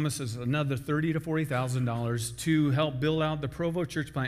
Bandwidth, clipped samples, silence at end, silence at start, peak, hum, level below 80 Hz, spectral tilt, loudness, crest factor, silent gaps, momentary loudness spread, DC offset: 15.5 kHz; under 0.1%; 0 s; 0 s; -14 dBFS; none; -54 dBFS; -6 dB/octave; -29 LUFS; 16 dB; none; 5 LU; under 0.1%